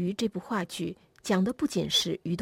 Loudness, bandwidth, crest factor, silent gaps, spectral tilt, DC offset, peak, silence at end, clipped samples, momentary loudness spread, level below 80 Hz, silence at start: -29 LUFS; 16 kHz; 16 dB; none; -4.5 dB/octave; under 0.1%; -14 dBFS; 0 s; under 0.1%; 10 LU; -62 dBFS; 0 s